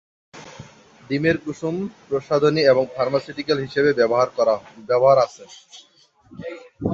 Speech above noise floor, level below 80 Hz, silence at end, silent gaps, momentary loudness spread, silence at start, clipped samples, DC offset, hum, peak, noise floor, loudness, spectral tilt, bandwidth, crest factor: 24 dB; -56 dBFS; 0 s; none; 19 LU; 0.35 s; under 0.1%; under 0.1%; none; -4 dBFS; -44 dBFS; -20 LUFS; -6 dB/octave; 7.8 kHz; 18 dB